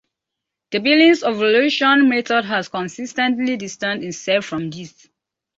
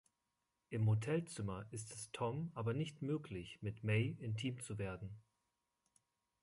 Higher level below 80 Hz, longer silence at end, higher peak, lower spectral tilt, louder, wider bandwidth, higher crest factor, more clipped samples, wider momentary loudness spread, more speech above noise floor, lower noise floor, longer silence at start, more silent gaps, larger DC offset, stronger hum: about the same, -64 dBFS vs -68 dBFS; second, 0.7 s vs 1.2 s; first, -4 dBFS vs -24 dBFS; second, -4 dB/octave vs -6 dB/octave; first, -17 LUFS vs -42 LUFS; second, 7.8 kHz vs 11.5 kHz; about the same, 16 dB vs 18 dB; neither; about the same, 13 LU vs 11 LU; first, 65 dB vs 47 dB; second, -82 dBFS vs -88 dBFS; about the same, 0.7 s vs 0.7 s; neither; neither; neither